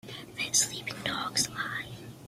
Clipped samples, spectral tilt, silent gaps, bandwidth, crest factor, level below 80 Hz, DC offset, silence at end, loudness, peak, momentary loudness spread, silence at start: under 0.1%; -1 dB/octave; none; 16 kHz; 22 dB; -64 dBFS; under 0.1%; 0 s; -29 LUFS; -12 dBFS; 13 LU; 0.05 s